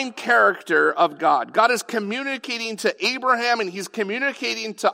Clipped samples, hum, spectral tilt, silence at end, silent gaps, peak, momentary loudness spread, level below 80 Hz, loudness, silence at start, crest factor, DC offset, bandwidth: under 0.1%; none; -2.5 dB/octave; 0 s; none; -4 dBFS; 9 LU; -86 dBFS; -21 LUFS; 0 s; 18 dB; under 0.1%; 16 kHz